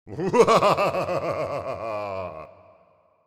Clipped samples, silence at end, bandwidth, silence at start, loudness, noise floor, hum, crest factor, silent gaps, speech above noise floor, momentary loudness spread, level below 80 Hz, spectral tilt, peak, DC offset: under 0.1%; 0.8 s; 15.5 kHz; 0.05 s; -23 LUFS; -60 dBFS; none; 20 dB; none; 40 dB; 16 LU; -58 dBFS; -5 dB/octave; -4 dBFS; under 0.1%